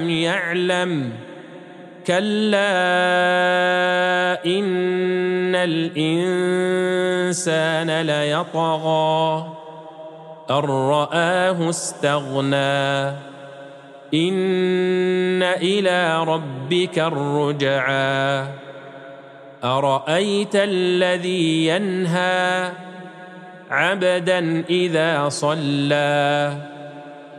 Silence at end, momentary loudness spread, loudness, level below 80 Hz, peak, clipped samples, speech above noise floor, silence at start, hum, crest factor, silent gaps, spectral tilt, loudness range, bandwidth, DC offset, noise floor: 0 s; 19 LU; -20 LUFS; -72 dBFS; -4 dBFS; under 0.1%; 21 dB; 0 s; none; 16 dB; none; -5 dB/octave; 3 LU; 12 kHz; under 0.1%; -40 dBFS